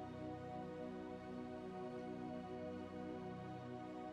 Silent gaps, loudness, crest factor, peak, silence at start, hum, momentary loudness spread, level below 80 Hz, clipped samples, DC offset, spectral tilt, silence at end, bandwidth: none; -50 LUFS; 12 dB; -38 dBFS; 0 s; none; 2 LU; -72 dBFS; under 0.1%; under 0.1%; -7.5 dB/octave; 0 s; 11.5 kHz